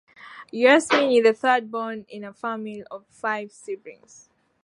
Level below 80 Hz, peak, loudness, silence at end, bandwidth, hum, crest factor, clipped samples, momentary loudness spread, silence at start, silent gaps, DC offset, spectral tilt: -76 dBFS; -2 dBFS; -21 LUFS; 0.7 s; 11.5 kHz; none; 22 dB; under 0.1%; 21 LU; 0.25 s; none; under 0.1%; -3.5 dB/octave